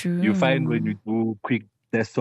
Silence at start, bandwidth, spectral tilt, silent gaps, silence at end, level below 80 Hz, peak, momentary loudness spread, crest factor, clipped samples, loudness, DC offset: 0 s; 11 kHz; -7.5 dB/octave; none; 0 s; -66 dBFS; -6 dBFS; 7 LU; 16 dB; under 0.1%; -24 LUFS; under 0.1%